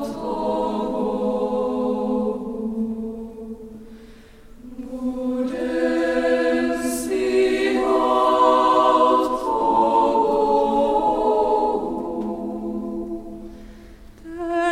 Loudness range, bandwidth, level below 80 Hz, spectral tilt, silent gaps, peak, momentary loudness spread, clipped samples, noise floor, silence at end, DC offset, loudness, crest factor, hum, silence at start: 10 LU; 16 kHz; -46 dBFS; -5 dB/octave; none; -4 dBFS; 18 LU; under 0.1%; -44 dBFS; 0 s; under 0.1%; -21 LUFS; 16 dB; none; 0 s